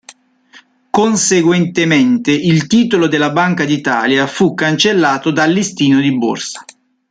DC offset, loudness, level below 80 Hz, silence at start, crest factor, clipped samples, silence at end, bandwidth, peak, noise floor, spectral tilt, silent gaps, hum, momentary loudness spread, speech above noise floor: under 0.1%; -13 LUFS; -54 dBFS; 0.95 s; 14 dB; under 0.1%; 0.5 s; 9.6 kHz; 0 dBFS; -45 dBFS; -4.5 dB/octave; none; none; 4 LU; 33 dB